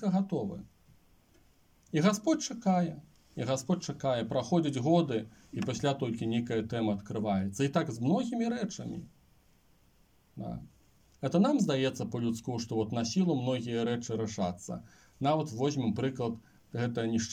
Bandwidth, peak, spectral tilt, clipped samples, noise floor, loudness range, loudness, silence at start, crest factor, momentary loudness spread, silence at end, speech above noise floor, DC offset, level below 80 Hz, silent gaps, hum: 15.5 kHz; -14 dBFS; -6 dB/octave; under 0.1%; -66 dBFS; 3 LU; -32 LUFS; 0 s; 18 dB; 14 LU; 0 s; 35 dB; under 0.1%; -66 dBFS; none; none